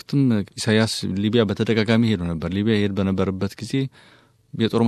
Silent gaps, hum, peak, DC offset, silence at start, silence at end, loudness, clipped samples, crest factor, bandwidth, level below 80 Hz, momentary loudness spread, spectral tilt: none; none; -4 dBFS; under 0.1%; 0.1 s; 0 s; -21 LUFS; under 0.1%; 18 dB; 13 kHz; -44 dBFS; 7 LU; -6 dB/octave